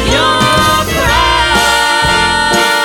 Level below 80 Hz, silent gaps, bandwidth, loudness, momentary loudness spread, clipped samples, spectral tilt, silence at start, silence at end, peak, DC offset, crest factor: -24 dBFS; none; over 20 kHz; -9 LUFS; 1 LU; under 0.1%; -3 dB/octave; 0 s; 0 s; 0 dBFS; under 0.1%; 10 dB